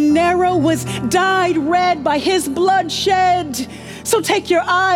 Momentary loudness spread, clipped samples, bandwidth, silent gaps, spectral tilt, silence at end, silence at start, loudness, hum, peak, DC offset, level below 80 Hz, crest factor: 5 LU; under 0.1%; 17 kHz; none; -4 dB/octave; 0 s; 0 s; -16 LUFS; none; -2 dBFS; under 0.1%; -46 dBFS; 14 dB